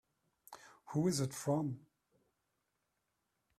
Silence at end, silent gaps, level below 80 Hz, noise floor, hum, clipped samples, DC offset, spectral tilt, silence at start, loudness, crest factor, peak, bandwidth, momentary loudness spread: 1.8 s; none; -76 dBFS; -85 dBFS; none; under 0.1%; under 0.1%; -6 dB/octave; 0.5 s; -37 LUFS; 18 dB; -22 dBFS; 14.5 kHz; 21 LU